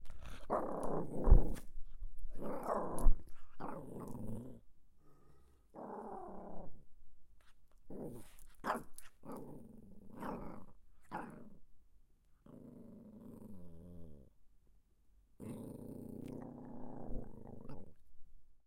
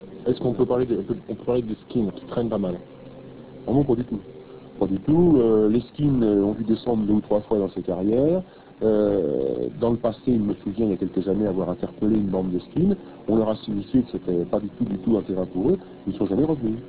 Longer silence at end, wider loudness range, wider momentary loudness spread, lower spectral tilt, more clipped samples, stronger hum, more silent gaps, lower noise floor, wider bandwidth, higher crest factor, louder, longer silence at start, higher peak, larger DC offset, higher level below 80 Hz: about the same, 0.1 s vs 0 s; first, 16 LU vs 5 LU; first, 19 LU vs 9 LU; second, -7.5 dB/octave vs -12.5 dB/octave; neither; neither; neither; first, -68 dBFS vs -41 dBFS; first, 12 kHz vs 4 kHz; first, 24 dB vs 14 dB; second, -44 LUFS vs -23 LUFS; about the same, 0 s vs 0 s; second, -12 dBFS vs -8 dBFS; second, under 0.1% vs 0.2%; first, -42 dBFS vs -48 dBFS